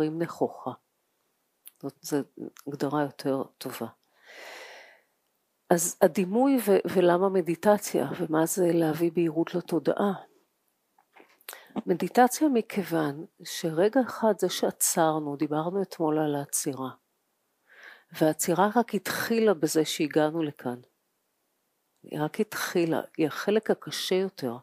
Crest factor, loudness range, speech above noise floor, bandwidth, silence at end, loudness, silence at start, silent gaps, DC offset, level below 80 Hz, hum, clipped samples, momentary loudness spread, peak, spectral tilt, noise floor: 22 dB; 9 LU; 49 dB; 15.5 kHz; 0 s; -27 LUFS; 0 s; none; under 0.1%; -80 dBFS; none; under 0.1%; 16 LU; -4 dBFS; -4.5 dB/octave; -76 dBFS